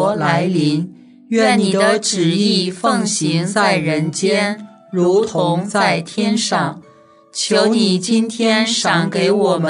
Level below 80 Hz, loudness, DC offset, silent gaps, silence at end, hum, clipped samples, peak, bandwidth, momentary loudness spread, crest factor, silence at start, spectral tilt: -66 dBFS; -16 LUFS; under 0.1%; none; 0 s; none; under 0.1%; 0 dBFS; 11 kHz; 6 LU; 16 dB; 0 s; -4.5 dB/octave